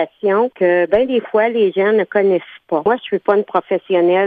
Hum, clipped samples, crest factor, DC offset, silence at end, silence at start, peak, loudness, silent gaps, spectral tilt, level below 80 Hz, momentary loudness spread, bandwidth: none; under 0.1%; 14 dB; under 0.1%; 0 s; 0 s; -2 dBFS; -16 LUFS; none; -8.5 dB/octave; -56 dBFS; 4 LU; 4.7 kHz